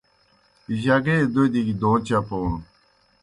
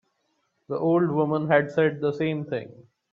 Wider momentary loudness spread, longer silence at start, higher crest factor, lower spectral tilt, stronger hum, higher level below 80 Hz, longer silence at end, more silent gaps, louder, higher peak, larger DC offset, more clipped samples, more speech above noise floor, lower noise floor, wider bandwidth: about the same, 9 LU vs 11 LU; about the same, 0.7 s vs 0.7 s; about the same, 16 dB vs 20 dB; second, -7.5 dB/octave vs -9 dB/octave; neither; first, -44 dBFS vs -68 dBFS; first, 0.6 s vs 0.3 s; neither; about the same, -22 LUFS vs -24 LUFS; about the same, -6 dBFS vs -6 dBFS; neither; neither; second, 40 dB vs 49 dB; second, -61 dBFS vs -73 dBFS; first, 11.5 kHz vs 7.2 kHz